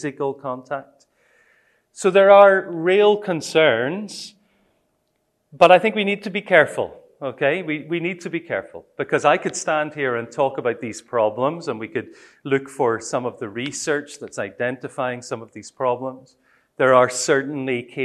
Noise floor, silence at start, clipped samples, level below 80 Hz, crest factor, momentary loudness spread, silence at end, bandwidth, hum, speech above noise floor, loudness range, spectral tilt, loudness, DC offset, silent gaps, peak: -70 dBFS; 0 s; under 0.1%; -70 dBFS; 20 dB; 16 LU; 0 s; 12.5 kHz; none; 50 dB; 9 LU; -4 dB/octave; -20 LUFS; under 0.1%; none; 0 dBFS